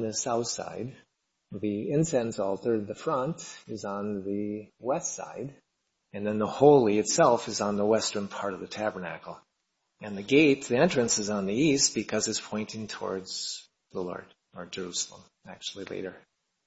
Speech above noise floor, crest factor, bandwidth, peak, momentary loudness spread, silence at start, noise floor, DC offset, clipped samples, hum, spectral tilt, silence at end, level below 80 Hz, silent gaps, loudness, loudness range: 51 dB; 22 dB; 8 kHz; -6 dBFS; 17 LU; 0 s; -79 dBFS; under 0.1%; under 0.1%; none; -4 dB/octave; 0.5 s; -66 dBFS; none; -28 LUFS; 10 LU